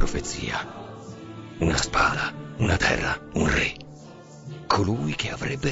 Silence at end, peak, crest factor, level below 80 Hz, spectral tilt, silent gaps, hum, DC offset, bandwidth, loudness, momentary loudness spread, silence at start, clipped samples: 0 s; -6 dBFS; 20 dB; -38 dBFS; -4.5 dB/octave; none; none; under 0.1%; 8 kHz; -25 LUFS; 19 LU; 0 s; under 0.1%